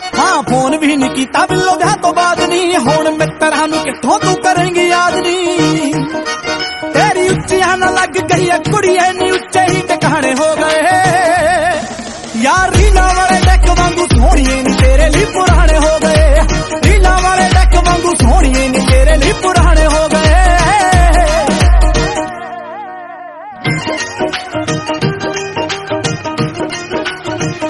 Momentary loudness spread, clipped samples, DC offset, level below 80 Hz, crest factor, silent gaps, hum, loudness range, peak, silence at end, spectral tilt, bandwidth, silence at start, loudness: 9 LU; 0.1%; under 0.1%; -16 dBFS; 10 dB; none; none; 7 LU; 0 dBFS; 0 s; -4.5 dB/octave; 12 kHz; 0 s; -11 LUFS